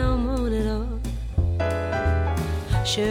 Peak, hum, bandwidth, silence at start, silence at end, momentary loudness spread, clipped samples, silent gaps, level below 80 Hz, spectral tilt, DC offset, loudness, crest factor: -10 dBFS; none; 15.5 kHz; 0 s; 0 s; 5 LU; under 0.1%; none; -28 dBFS; -6 dB/octave; under 0.1%; -25 LUFS; 14 dB